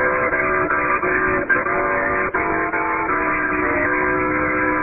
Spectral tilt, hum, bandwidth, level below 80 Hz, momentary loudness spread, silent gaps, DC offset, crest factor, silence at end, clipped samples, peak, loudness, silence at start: -11.5 dB/octave; none; 3.1 kHz; -40 dBFS; 2 LU; none; under 0.1%; 14 dB; 0 s; under 0.1%; -6 dBFS; -18 LUFS; 0 s